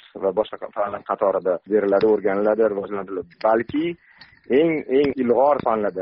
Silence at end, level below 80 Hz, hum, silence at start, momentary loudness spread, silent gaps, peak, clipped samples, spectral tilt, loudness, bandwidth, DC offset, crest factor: 0 s; -58 dBFS; none; 0.15 s; 10 LU; none; -6 dBFS; under 0.1%; -5 dB/octave; -21 LUFS; 5.6 kHz; under 0.1%; 14 dB